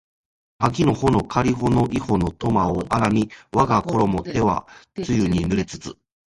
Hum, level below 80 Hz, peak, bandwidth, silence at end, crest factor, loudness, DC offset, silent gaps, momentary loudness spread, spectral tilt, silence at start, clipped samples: none; -40 dBFS; -2 dBFS; 11.5 kHz; 0.4 s; 20 dB; -21 LUFS; under 0.1%; none; 7 LU; -7 dB/octave; 0.6 s; under 0.1%